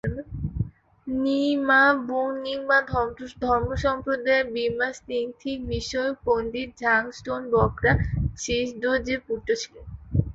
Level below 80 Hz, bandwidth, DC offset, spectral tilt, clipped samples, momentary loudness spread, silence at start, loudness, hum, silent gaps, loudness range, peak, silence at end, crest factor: -40 dBFS; 8 kHz; under 0.1%; -5.5 dB/octave; under 0.1%; 11 LU; 0.05 s; -25 LUFS; none; none; 3 LU; -8 dBFS; 0 s; 18 dB